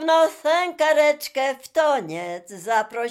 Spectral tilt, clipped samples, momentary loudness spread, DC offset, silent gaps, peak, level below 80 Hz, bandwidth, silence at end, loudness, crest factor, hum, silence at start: -3 dB/octave; under 0.1%; 12 LU; under 0.1%; none; -8 dBFS; -76 dBFS; 16 kHz; 0 s; -21 LUFS; 14 dB; none; 0 s